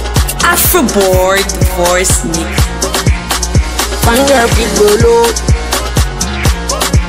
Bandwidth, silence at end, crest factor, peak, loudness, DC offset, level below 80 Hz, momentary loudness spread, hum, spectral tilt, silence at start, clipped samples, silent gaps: 16.5 kHz; 0 s; 10 dB; 0 dBFS; -10 LUFS; under 0.1%; -16 dBFS; 6 LU; none; -4 dB/octave; 0 s; under 0.1%; none